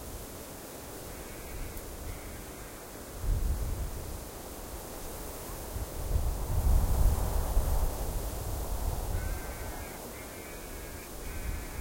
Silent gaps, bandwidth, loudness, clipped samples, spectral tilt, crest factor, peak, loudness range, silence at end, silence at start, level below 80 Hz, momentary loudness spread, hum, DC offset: none; 16.5 kHz; -37 LUFS; under 0.1%; -5 dB/octave; 20 dB; -14 dBFS; 6 LU; 0 s; 0 s; -34 dBFS; 12 LU; none; under 0.1%